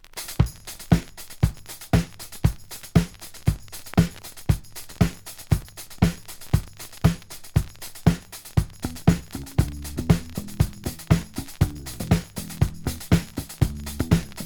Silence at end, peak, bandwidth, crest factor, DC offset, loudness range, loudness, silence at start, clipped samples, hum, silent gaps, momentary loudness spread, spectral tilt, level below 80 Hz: 0 s; -2 dBFS; over 20 kHz; 22 dB; under 0.1%; 1 LU; -26 LUFS; 0.05 s; under 0.1%; none; none; 12 LU; -6 dB/octave; -34 dBFS